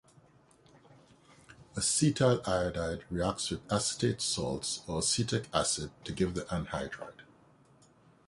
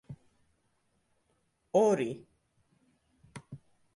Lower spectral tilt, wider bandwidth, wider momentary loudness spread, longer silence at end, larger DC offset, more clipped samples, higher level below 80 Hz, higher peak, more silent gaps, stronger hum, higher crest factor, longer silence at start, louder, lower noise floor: second, -4 dB/octave vs -6 dB/octave; about the same, 11.5 kHz vs 11.5 kHz; second, 11 LU vs 26 LU; first, 1.05 s vs 0.4 s; neither; neither; first, -54 dBFS vs -74 dBFS; about the same, -12 dBFS vs -14 dBFS; neither; neither; about the same, 22 dB vs 22 dB; first, 1.5 s vs 0.1 s; second, -32 LUFS vs -29 LUFS; second, -62 dBFS vs -75 dBFS